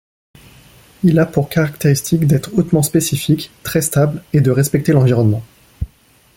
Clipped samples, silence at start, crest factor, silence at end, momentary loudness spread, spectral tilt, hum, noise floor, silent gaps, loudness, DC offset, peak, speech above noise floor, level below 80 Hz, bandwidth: under 0.1%; 1.05 s; 14 dB; 0.5 s; 7 LU; -6 dB/octave; none; -51 dBFS; none; -15 LUFS; under 0.1%; -2 dBFS; 37 dB; -42 dBFS; 17 kHz